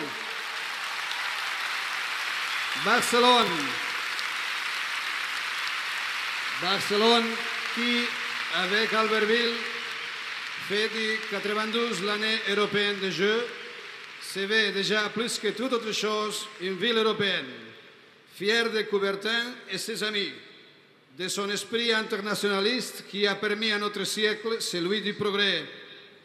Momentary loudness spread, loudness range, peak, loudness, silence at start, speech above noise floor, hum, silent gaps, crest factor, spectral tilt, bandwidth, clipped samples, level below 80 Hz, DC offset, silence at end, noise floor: 9 LU; 4 LU; -8 dBFS; -26 LUFS; 0 s; 29 dB; none; none; 20 dB; -2.5 dB/octave; 15 kHz; under 0.1%; -84 dBFS; under 0.1%; 0.1 s; -56 dBFS